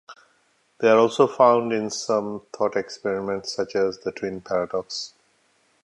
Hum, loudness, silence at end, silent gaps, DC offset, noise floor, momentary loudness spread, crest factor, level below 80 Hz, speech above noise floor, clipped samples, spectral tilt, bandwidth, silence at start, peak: none; -23 LUFS; 0.75 s; none; under 0.1%; -65 dBFS; 13 LU; 22 dB; -64 dBFS; 42 dB; under 0.1%; -4.5 dB/octave; 11 kHz; 0.1 s; -2 dBFS